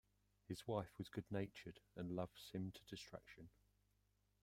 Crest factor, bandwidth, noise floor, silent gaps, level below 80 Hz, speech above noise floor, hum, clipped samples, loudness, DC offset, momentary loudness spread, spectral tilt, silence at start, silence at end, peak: 24 dB; 16 kHz; -82 dBFS; none; -76 dBFS; 32 dB; 50 Hz at -70 dBFS; under 0.1%; -51 LUFS; under 0.1%; 12 LU; -6.5 dB/octave; 0.5 s; 0.95 s; -28 dBFS